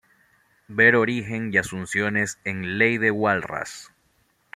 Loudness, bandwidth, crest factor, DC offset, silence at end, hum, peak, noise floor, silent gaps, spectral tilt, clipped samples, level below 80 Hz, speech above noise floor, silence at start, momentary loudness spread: -22 LUFS; 14.5 kHz; 22 dB; under 0.1%; 0.7 s; none; -4 dBFS; -65 dBFS; none; -5 dB/octave; under 0.1%; -60 dBFS; 43 dB; 0.7 s; 14 LU